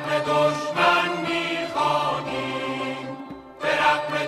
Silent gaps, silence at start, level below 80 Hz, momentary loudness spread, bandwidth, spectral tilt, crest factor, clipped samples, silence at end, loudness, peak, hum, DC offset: none; 0 s; -60 dBFS; 11 LU; 15 kHz; -4 dB/octave; 18 dB; under 0.1%; 0 s; -23 LUFS; -6 dBFS; none; under 0.1%